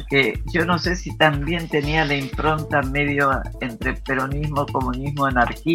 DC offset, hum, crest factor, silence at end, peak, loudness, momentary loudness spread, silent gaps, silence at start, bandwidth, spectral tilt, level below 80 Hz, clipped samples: under 0.1%; none; 20 dB; 0 s; -2 dBFS; -21 LUFS; 6 LU; none; 0 s; 16.5 kHz; -6 dB/octave; -32 dBFS; under 0.1%